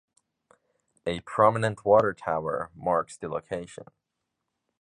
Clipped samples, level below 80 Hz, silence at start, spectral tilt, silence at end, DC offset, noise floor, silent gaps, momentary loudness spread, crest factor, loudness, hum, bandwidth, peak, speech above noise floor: under 0.1%; -60 dBFS; 1.05 s; -6 dB/octave; 1 s; under 0.1%; -83 dBFS; none; 14 LU; 22 dB; -27 LUFS; none; 10.5 kHz; -6 dBFS; 57 dB